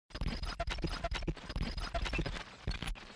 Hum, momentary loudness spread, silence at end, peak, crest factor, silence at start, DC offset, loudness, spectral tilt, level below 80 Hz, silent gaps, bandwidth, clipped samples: none; 4 LU; 0 s; -26 dBFS; 14 dB; 0.1 s; under 0.1%; -40 LUFS; -5 dB/octave; -40 dBFS; none; 11 kHz; under 0.1%